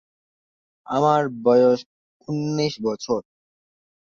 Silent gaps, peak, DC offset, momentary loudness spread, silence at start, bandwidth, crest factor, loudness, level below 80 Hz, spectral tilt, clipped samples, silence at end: 1.86-2.20 s; -6 dBFS; under 0.1%; 10 LU; 0.9 s; 7.4 kHz; 18 dB; -21 LUFS; -64 dBFS; -6.5 dB/octave; under 0.1%; 0.9 s